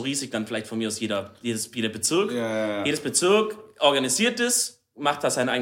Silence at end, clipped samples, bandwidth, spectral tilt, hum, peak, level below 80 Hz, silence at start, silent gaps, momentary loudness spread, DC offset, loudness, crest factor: 0 s; under 0.1%; 16.5 kHz; -2.5 dB/octave; none; -6 dBFS; -70 dBFS; 0 s; none; 9 LU; under 0.1%; -24 LUFS; 20 dB